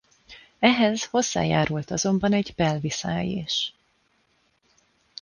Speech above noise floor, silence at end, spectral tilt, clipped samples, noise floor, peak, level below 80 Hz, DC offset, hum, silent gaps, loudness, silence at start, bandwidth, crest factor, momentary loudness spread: 44 dB; 1.5 s; -4.5 dB/octave; under 0.1%; -67 dBFS; -6 dBFS; -54 dBFS; under 0.1%; none; none; -24 LUFS; 0.3 s; 10 kHz; 20 dB; 7 LU